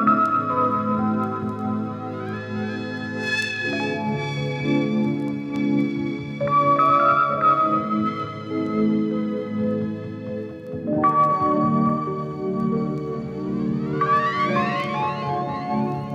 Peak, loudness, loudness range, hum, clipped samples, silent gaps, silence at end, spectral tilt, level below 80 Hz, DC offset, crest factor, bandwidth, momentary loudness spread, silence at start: -8 dBFS; -22 LUFS; 5 LU; none; under 0.1%; none; 0 s; -7 dB/octave; -58 dBFS; under 0.1%; 16 dB; 10 kHz; 11 LU; 0 s